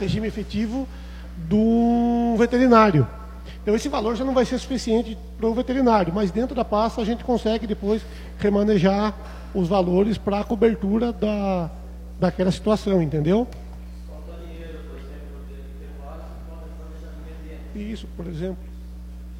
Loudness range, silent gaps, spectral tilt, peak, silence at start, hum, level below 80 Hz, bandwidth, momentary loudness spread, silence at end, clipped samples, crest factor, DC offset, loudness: 17 LU; none; -7 dB/octave; -2 dBFS; 0 s; 60 Hz at -35 dBFS; -36 dBFS; 12 kHz; 20 LU; 0 s; under 0.1%; 20 dB; under 0.1%; -22 LUFS